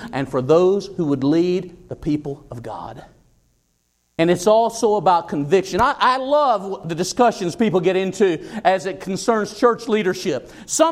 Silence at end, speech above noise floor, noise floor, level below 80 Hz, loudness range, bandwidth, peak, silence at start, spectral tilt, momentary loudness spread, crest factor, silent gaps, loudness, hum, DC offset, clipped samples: 0 s; 48 dB; -67 dBFS; -50 dBFS; 6 LU; 15.5 kHz; -2 dBFS; 0 s; -5 dB/octave; 13 LU; 16 dB; none; -19 LUFS; none; under 0.1%; under 0.1%